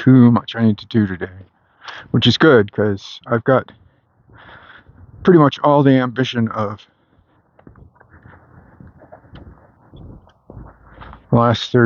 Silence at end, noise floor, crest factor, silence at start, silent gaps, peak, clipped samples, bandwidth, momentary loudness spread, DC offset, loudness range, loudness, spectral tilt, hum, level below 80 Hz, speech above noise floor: 0 s; -57 dBFS; 18 dB; 0 s; none; 0 dBFS; under 0.1%; 7.2 kHz; 16 LU; under 0.1%; 9 LU; -15 LUFS; -7.5 dB/octave; none; -50 dBFS; 42 dB